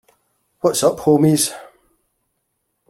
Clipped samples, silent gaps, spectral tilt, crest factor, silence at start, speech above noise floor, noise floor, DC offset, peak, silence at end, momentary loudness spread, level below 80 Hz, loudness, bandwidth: under 0.1%; none; -5 dB/octave; 18 dB; 0.65 s; 57 dB; -72 dBFS; under 0.1%; -2 dBFS; 1.25 s; 8 LU; -58 dBFS; -17 LUFS; 16.5 kHz